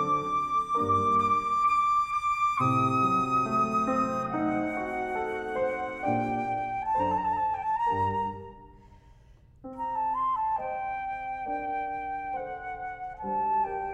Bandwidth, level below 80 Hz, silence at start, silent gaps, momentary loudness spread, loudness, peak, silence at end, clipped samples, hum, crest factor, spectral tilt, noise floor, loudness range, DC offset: 12 kHz; -56 dBFS; 0 s; none; 11 LU; -28 LUFS; -14 dBFS; 0 s; under 0.1%; none; 14 dB; -6.5 dB/octave; -55 dBFS; 7 LU; under 0.1%